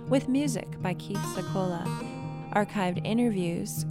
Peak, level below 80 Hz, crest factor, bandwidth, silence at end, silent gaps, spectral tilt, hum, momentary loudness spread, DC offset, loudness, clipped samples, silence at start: -12 dBFS; -56 dBFS; 18 dB; 16 kHz; 0 s; none; -6 dB/octave; none; 7 LU; under 0.1%; -30 LUFS; under 0.1%; 0 s